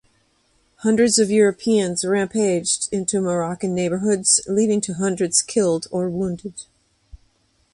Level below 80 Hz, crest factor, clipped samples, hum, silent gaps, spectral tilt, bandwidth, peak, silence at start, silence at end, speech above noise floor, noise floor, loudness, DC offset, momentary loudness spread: -56 dBFS; 18 dB; under 0.1%; none; none; -4 dB/octave; 11.5 kHz; -4 dBFS; 0.8 s; 1.1 s; 43 dB; -63 dBFS; -19 LUFS; under 0.1%; 9 LU